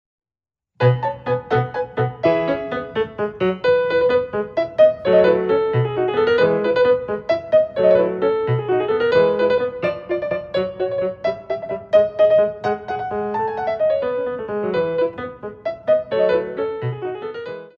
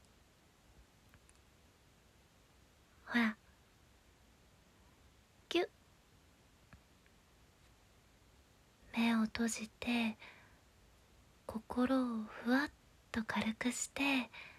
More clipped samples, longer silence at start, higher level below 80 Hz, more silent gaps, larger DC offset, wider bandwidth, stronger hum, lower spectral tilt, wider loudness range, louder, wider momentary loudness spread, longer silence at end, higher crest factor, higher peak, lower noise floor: neither; second, 0.8 s vs 3.05 s; first, -54 dBFS vs -68 dBFS; neither; neither; second, 6.6 kHz vs 15 kHz; neither; first, -8.5 dB/octave vs -3.5 dB/octave; second, 5 LU vs 8 LU; first, -19 LUFS vs -37 LUFS; second, 10 LU vs 14 LU; about the same, 0.1 s vs 0.05 s; second, 16 dB vs 22 dB; first, -2 dBFS vs -20 dBFS; first, under -90 dBFS vs -68 dBFS